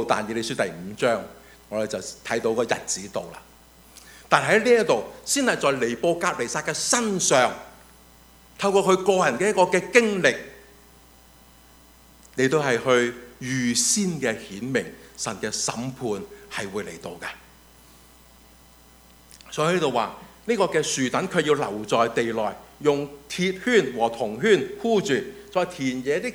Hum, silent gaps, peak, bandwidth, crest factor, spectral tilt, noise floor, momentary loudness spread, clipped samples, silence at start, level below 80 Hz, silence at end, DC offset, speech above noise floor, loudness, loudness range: none; none; 0 dBFS; over 20 kHz; 24 dB; -3.5 dB/octave; -52 dBFS; 13 LU; under 0.1%; 0 s; -58 dBFS; 0 s; under 0.1%; 29 dB; -23 LUFS; 8 LU